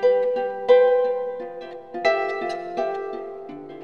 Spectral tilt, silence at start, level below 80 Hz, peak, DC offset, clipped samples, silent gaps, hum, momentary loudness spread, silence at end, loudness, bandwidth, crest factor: -4.5 dB/octave; 0 s; -64 dBFS; -4 dBFS; 0.2%; under 0.1%; none; none; 19 LU; 0 s; -22 LUFS; 6.6 kHz; 18 dB